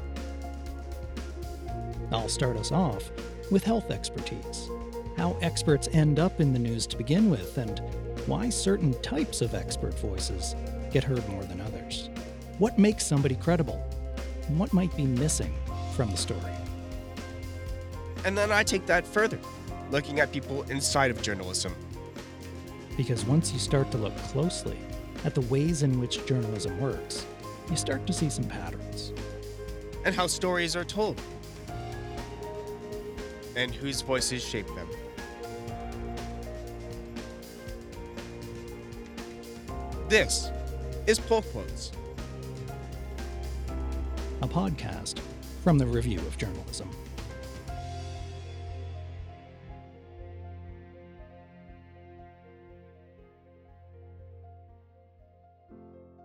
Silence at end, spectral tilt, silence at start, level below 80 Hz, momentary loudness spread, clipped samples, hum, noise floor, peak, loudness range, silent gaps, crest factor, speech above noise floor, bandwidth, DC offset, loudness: 0 s; -5 dB/octave; 0 s; -42 dBFS; 17 LU; under 0.1%; none; -58 dBFS; -8 dBFS; 13 LU; none; 22 dB; 30 dB; over 20 kHz; under 0.1%; -30 LUFS